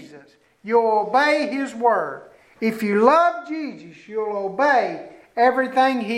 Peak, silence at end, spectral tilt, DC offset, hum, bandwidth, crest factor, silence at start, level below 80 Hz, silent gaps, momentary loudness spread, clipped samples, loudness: -2 dBFS; 0 s; -5 dB/octave; under 0.1%; none; 15.5 kHz; 18 dB; 0 s; -70 dBFS; none; 14 LU; under 0.1%; -20 LUFS